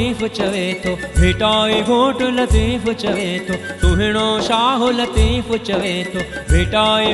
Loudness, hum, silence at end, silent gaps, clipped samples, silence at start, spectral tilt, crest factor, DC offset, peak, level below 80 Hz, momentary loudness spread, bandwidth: -17 LUFS; none; 0 s; none; under 0.1%; 0 s; -5 dB/octave; 16 dB; under 0.1%; -2 dBFS; -24 dBFS; 6 LU; 12 kHz